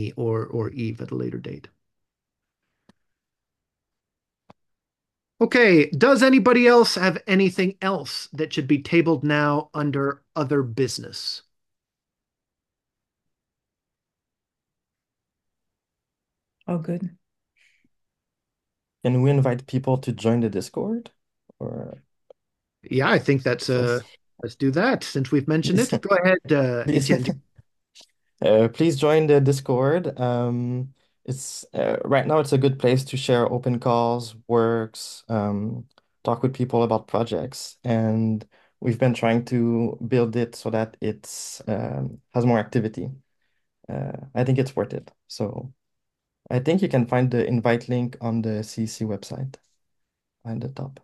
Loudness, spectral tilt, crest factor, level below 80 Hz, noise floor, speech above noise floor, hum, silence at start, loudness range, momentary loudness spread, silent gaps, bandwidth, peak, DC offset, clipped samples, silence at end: -22 LUFS; -6.5 dB/octave; 20 dB; -64 dBFS; -86 dBFS; 64 dB; none; 0 s; 12 LU; 14 LU; none; 12.5 kHz; -2 dBFS; under 0.1%; under 0.1%; 0.1 s